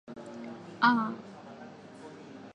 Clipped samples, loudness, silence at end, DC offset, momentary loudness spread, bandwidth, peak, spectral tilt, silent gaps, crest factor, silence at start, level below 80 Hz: under 0.1%; -28 LUFS; 0.05 s; under 0.1%; 22 LU; 9 kHz; -10 dBFS; -5.5 dB/octave; none; 24 dB; 0.1 s; -78 dBFS